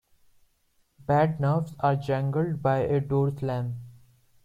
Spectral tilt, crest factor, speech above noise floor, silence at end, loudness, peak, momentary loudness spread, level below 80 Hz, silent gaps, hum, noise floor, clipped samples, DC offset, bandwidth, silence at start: -9 dB/octave; 16 dB; 43 dB; 0.5 s; -26 LUFS; -10 dBFS; 8 LU; -56 dBFS; none; none; -68 dBFS; under 0.1%; under 0.1%; 7.4 kHz; 1 s